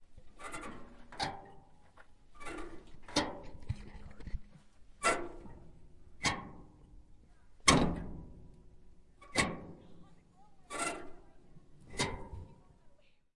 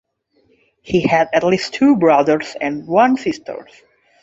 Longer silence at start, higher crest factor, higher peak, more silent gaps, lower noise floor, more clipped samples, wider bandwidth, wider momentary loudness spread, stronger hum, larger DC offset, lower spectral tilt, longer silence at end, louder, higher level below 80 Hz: second, 0 s vs 0.85 s; first, 32 dB vs 16 dB; second, -8 dBFS vs 0 dBFS; neither; about the same, -61 dBFS vs -60 dBFS; neither; first, 11.5 kHz vs 8 kHz; first, 24 LU vs 11 LU; neither; neither; second, -3 dB/octave vs -6 dB/octave; second, 0.25 s vs 0.6 s; second, -36 LUFS vs -16 LUFS; about the same, -52 dBFS vs -54 dBFS